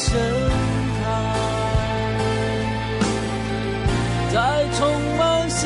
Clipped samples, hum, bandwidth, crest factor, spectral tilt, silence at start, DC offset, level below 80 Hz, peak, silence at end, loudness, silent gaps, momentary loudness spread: under 0.1%; none; 11.5 kHz; 12 dB; -5 dB/octave; 0 s; under 0.1%; -32 dBFS; -8 dBFS; 0 s; -22 LUFS; none; 4 LU